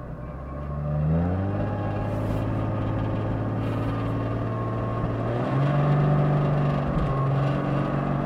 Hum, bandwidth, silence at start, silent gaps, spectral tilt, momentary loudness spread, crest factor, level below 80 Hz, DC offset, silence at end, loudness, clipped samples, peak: none; 5.8 kHz; 0 s; none; -9.5 dB/octave; 6 LU; 14 dB; -38 dBFS; under 0.1%; 0 s; -26 LUFS; under 0.1%; -12 dBFS